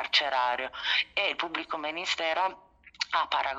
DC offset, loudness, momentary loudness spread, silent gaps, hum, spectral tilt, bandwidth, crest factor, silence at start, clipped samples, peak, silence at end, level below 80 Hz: under 0.1%; -29 LUFS; 7 LU; none; none; -0.5 dB/octave; 9.2 kHz; 20 dB; 0 s; under 0.1%; -10 dBFS; 0 s; -66 dBFS